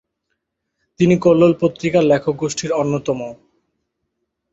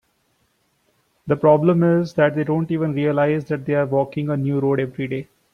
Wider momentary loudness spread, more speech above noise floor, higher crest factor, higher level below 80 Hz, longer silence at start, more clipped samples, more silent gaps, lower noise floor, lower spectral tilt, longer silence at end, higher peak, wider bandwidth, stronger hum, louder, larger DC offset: about the same, 10 LU vs 10 LU; first, 59 dB vs 47 dB; about the same, 16 dB vs 18 dB; first, -54 dBFS vs -60 dBFS; second, 1 s vs 1.25 s; neither; neither; first, -75 dBFS vs -66 dBFS; second, -6.5 dB/octave vs -9 dB/octave; first, 1.2 s vs 0.3 s; about the same, -2 dBFS vs -2 dBFS; first, 8 kHz vs 6.8 kHz; neither; first, -17 LUFS vs -20 LUFS; neither